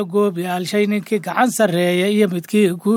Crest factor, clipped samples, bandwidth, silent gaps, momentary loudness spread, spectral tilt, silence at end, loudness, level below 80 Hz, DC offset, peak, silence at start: 14 dB; under 0.1%; 17 kHz; none; 5 LU; -5.5 dB/octave; 0 s; -18 LUFS; -70 dBFS; under 0.1%; -4 dBFS; 0 s